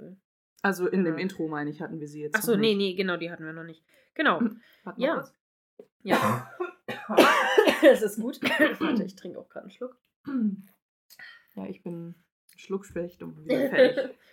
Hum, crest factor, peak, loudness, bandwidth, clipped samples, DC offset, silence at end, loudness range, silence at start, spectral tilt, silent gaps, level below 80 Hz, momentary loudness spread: none; 22 dB; -4 dBFS; -26 LUFS; 17 kHz; under 0.1%; under 0.1%; 0.2 s; 13 LU; 0 s; -5 dB/octave; 0.25-0.56 s, 5.40-5.77 s, 5.92-6.00 s, 10.01-10.05 s, 10.16-10.24 s, 10.82-11.09 s, 12.32-12.48 s; -72 dBFS; 22 LU